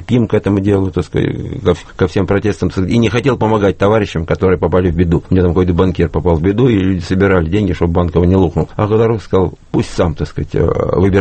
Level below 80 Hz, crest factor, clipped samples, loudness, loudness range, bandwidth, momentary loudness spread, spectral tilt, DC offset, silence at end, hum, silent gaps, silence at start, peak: -30 dBFS; 12 dB; under 0.1%; -14 LUFS; 2 LU; 8.8 kHz; 5 LU; -8 dB/octave; under 0.1%; 0 s; none; none; 0 s; 0 dBFS